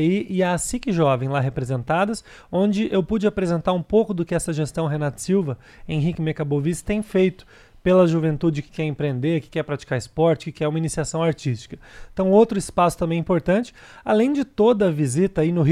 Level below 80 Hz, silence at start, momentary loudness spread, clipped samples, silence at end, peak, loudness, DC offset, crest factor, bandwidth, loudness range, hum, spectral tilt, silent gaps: -46 dBFS; 0 s; 9 LU; under 0.1%; 0 s; -4 dBFS; -22 LUFS; under 0.1%; 16 dB; 14 kHz; 3 LU; none; -6.5 dB/octave; none